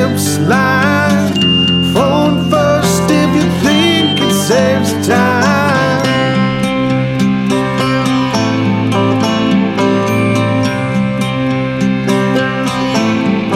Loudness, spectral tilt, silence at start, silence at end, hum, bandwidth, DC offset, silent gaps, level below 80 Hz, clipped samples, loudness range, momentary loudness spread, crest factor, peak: -12 LUFS; -5 dB/octave; 0 s; 0 s; none; 16 kHz; under 0.1%; none; -40 dBFS; under 0.1%; 3 LU; 4 LU; 12 dB; 0 dBFS